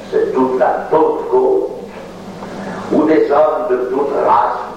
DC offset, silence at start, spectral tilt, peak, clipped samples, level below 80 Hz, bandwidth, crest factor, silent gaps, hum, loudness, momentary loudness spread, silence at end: under 0.1%; 0 s; -7 dB/octave; -2 dBFS; under 0.1%; -50 dBFS; 9.6 kHz; 14 dB; none; none; -14 LUFS; 17 LU; 0 s